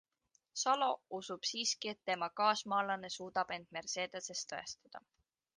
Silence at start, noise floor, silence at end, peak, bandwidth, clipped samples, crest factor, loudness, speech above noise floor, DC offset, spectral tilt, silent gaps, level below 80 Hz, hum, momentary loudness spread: 0.55 s; -78 dBFS; 0.6 s; -18 dBFS; 10.5 kHz; under 0.1%; 22 dB; -37 LUFS; 40 dB; under 0.1%; -1.5 dB/octave; none; -82 dBFS; none; 13 LU